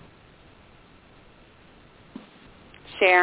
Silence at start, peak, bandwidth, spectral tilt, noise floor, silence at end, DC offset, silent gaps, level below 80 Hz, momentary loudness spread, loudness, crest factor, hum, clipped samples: 2.95 s; -4 dBFS; 4 kHz; -6.5 dB/octave; -53 dBFS; 0 s; under 0.1%; none; -60 dBFS; 30 LU; -20 LUFS; 24 dB; none; under 0.1%